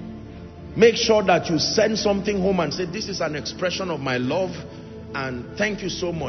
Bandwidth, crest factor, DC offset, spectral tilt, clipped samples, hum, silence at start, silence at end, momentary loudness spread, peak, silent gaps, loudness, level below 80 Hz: 6.4 kHz; 18 dB; under 0.1%; -4.5 dB/octave; under 0.1%; none; 0 s; 0 s; 18 LU; -4 dBFS; none; -22 LUFS; -48 dBFS